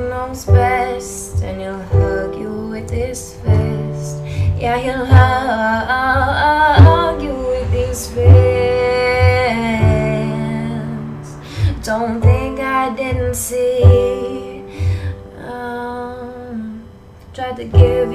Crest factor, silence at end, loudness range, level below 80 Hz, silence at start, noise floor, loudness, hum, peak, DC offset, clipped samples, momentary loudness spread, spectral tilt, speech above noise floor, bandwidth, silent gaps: 14 dB; 0 s; 7 LU; -28 dBFS; 0 s; -38 dBFS; -16 LUFS; none; 0 dBFS; under 0.1%; 0.1%; 17 LU; -6.5 dB/octave; 25 dB; 13.5 kHz; none